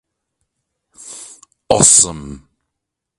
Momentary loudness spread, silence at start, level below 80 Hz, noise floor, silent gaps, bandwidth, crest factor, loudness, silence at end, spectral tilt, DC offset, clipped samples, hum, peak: 26 LU; 1.05 s; -44 dBFS; -79 dBFS; none; 16 kHz; 20 dB; -10 LUFS; 0.8 s; -2.5 dB/octave; under 0.1%; under 0.1%; none; 0 dBFS